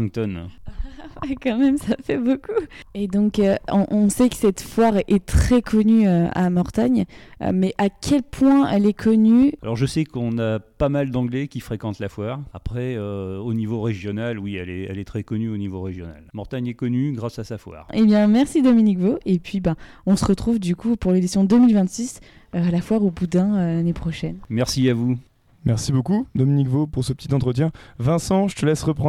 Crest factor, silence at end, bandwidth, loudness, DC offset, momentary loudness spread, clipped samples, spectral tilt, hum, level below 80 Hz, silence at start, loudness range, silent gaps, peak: 14 dB; 0 s; 13.5 kHz; -21 LUFS; under 0.1%; 13 LU; under 0.1%; -7 dB/octave; none; -38 dBFS; 0 s; 9 LU; none; -6 dBFS